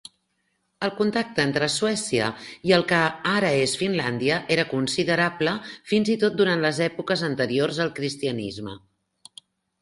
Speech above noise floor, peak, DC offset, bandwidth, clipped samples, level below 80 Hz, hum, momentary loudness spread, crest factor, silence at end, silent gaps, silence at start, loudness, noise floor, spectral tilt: 49 dB; -4 dBFS; under 0.1%; 11.5 kHz; under 0.1%; -62 dBFS; none; 8 LU; 20 dB; 1.05 s; none; 0.8 s; -23 LUFS; -73 dBFS; -4.5 dB/octave